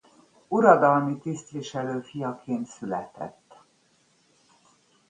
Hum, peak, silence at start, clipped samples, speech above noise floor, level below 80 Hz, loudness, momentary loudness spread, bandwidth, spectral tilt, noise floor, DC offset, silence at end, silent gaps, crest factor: none; -4 dBFS; 0.5 s; under 0.1%; 40 dB; -72 dBFS; -25 LUFS; 16 LU; 9.8 kHz; -6.5 dB/octave; -65 dBFS; under 0.1%; 1.8 s; none; 24 dB